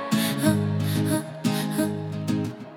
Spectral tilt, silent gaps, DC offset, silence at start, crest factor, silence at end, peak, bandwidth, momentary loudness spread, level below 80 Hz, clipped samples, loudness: -5.5 dB/octave; none; under 0.1%; 0 s; 18 dB; 0 s; -8 dBFS; 18 kHz; 5 LU; -62 dBFS; under 0.1%; -25 LUFS